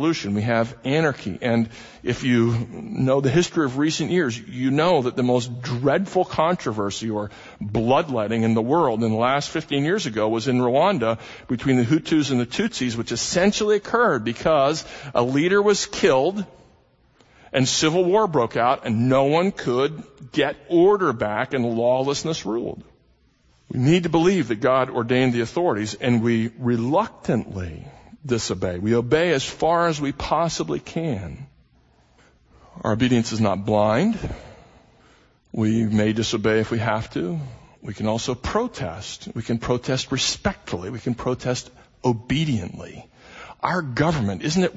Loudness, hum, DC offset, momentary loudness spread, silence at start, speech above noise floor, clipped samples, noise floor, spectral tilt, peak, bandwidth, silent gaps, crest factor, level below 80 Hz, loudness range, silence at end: -22 LUFS; none; under 0.1%; 11 LU; 0 s; 38 dB; under 0.1%; -60 dBFS; -5.5 dB/octave; -4 dBFS; 8 kHz; none; 18 dB; -48 dBFS; 5 LU; 0 s